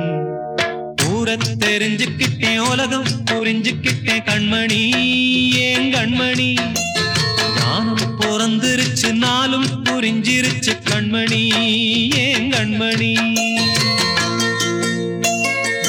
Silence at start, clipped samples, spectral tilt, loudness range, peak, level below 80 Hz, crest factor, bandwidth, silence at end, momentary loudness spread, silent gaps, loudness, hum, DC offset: 0 s; under 0.1%; -3.5 dB/octave; 2 LU; -6 dBFS; -52 dBFS; 12 dB; over 20 kHz; 0 s; 4 LU; none; -16 LUFS; none; under 0.1%